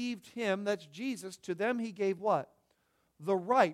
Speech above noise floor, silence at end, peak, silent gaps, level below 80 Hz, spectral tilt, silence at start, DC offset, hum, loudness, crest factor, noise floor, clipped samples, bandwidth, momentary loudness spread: 42 dB; 0 s; -14 dBFS; none; -82 dBFS; -5.5 dB/octave; 0 s; under 0.1%; none; -34 LUFS; 20 dB; -75 dBFS; under 0.1%; 14.5 kHz; 11 LU